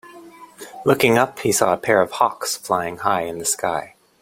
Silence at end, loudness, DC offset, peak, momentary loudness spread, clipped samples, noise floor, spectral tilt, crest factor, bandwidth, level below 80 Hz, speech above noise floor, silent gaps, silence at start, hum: 0.35 s; -19 LUFS; under 0.1%; -2 dBFS; 9 LU; under 0.1%; -42 dBFS; -3.5 dB/octave; 18 dB; 16.5 kHz; -58 dBFS; 23 dB; none; 0.05 s; none